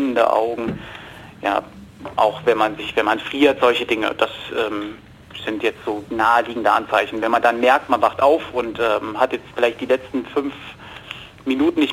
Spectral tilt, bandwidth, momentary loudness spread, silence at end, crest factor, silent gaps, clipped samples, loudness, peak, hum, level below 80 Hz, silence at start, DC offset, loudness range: -5 dB/octave; 17 kHz; 17 LU; 0 s; 18 dB; none; under 0.1%; -19 LUFS; -2 dBFS; none; -52 dBFS; 0 s; under 0.1%; 3 LU